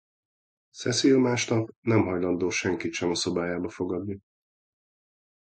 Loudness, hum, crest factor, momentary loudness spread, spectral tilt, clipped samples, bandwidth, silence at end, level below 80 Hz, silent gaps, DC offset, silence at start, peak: -26 LUFS; none; 18 dB; 11 LU; -4.5 dB/octave; under 0.1%; 9.2 kHz; 1.35 s; -56 dBFS; 1.76-1.83 s; under 0.1%; 0.75 s; -10 dBFS